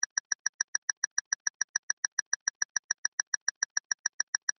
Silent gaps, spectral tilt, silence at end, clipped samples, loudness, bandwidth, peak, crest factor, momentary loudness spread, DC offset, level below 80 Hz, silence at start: 0.06-3.90 s, 3.99-4.33 s, 4.43-4.48 s; 5 dB/octave; 0.1 s; under 0.1%; -31 LUFS; 6.6 kHz; -12 dBFS; 22 dB; 2 LU; under 0.1%; -88 dBFS; 0 s